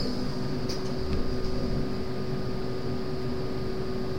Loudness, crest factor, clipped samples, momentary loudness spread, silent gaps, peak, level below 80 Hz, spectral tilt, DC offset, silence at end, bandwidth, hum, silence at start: -32 LUFS; 14 dB; under 0.1%; 2 LU; none; -16 dBFS; -36 dBFS; -6.5 dB/octave; 3%; 0 s; 16 kHz; none; 0 s